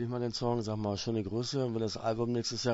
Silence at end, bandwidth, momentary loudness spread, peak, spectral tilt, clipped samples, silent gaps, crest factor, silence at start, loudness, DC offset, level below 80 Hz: 0 s; 8 kHz; 2 LU; -18 dBFS; -5.5 dB/octave; under 0.1%; none; 16 dB; 0 s; -33 LUFS; under 0.1%; -60 dBFS